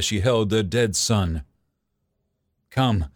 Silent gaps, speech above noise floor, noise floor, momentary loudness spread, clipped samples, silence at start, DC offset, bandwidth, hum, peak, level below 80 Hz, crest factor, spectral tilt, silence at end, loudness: none; 53 dB; -75 dBFS; 8 LU; under 0.1%; 0 s; under 0.1%; 18 kHz; none; -8 dBFS; -40 dBFS; 16 dB; -4.5 dB/octave; 0.1 s; -22 LUFS